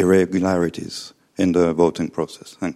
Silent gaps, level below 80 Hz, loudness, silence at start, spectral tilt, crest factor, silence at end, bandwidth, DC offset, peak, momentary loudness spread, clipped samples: none; -52 dBFS; -20 LUFS; 0 s; -6.5 dB/octave; 16 dB; 0 s; 13 kHz; under 0.1%; -4 dBFS; 14 LU; under 0.1%